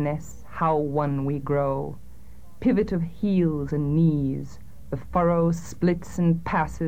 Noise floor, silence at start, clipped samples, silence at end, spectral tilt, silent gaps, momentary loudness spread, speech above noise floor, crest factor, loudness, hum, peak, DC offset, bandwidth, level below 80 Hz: -48 dBFS; 0 s; under 0.1%; 0 s; -8.5 dB/octave; none; 12 LU; 24 dB; 16 dB; -25 LUFS; none; -10 dBFS; 1%; 15.5 kHz; -44 dBFS